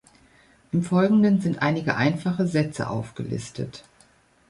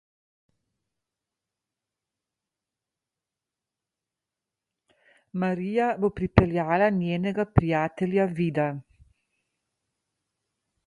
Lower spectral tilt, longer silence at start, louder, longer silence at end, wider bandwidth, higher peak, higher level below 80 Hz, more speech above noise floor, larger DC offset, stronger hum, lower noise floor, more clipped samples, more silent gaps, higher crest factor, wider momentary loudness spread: second, -7 dB/octave vs -9 dB/octave; second, 0.75 s vs 5.35 s; about the same, -24 LUFS vs -25 LUFS; second, 0.7 s vs 2.05 s; about the same, 11.5 kHz vs 10.5 kHz; second, -6 dBFS vs 0 dBFS; second, -58 dBFS vs -46 dBFS; second, 36 dB vs 64 dB; neither; neither; second, -58 dBFS vs -89 dBFS; neither; neither; second, 18 dB vs 28 dB; first, 13 LU vs 7 LU